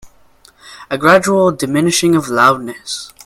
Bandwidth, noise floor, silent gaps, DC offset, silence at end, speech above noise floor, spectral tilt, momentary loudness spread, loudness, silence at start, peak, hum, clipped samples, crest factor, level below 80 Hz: 16 kHz; -48 dBFS; none; under 0.1%; 0.15 s; 35 dB; -4 dB/octave; 14 LU; -13 LUFS; 0.05 s; 0 dBFS; none; under 0.1%; 14 dB; -52 dBFS